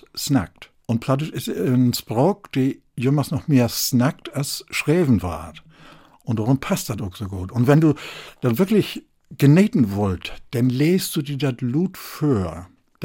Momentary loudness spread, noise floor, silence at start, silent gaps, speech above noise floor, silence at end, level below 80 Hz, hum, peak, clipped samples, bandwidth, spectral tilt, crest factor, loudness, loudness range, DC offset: 13 LU; -48 dBFS; 0.15 s; none; 27 dB; 0 s; -52 dBFS; none; -4 dBFS; under 0.1%; 17 kHz; -6 dB/octave; 16 dB; -21 LUFS; 3 LU; under 0.1%